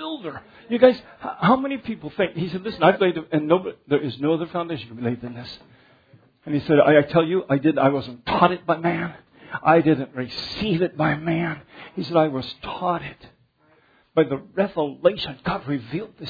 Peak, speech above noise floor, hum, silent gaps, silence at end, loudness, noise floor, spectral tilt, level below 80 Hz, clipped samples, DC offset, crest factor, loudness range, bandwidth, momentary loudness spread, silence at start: -2 dBFS; 38 dB; none; none; 0 s; -22 LUFS; -60 dBFS; -8.5 dB/octave; -56 dBFS; under 0.1%; under 0.1%; 22 dB; 6 LU; 5 kHz; 14 LU; 0 s